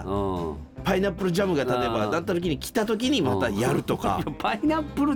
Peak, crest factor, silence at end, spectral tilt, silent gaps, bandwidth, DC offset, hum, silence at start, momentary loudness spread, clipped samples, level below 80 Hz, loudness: -10 dBFS; 14 dB; 0 s; -5.5 dB/octave; none; over 20 kHz; under 0.1%; none; 0 s; 4 LU; under 0.1%; -44 dBFS; -25 LUFS